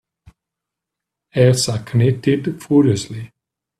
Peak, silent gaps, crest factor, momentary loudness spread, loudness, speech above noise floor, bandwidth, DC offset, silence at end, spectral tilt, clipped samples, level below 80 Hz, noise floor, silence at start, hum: 0 dBFS; none; 18 dB; 11 LU; -17 LUFS; 67 dB; 13 kHz; under 0.1%; 0.55 s; -6 dB/octave; under 0.1%; -52 dBFS; -83 dBFS; 1.35 s; none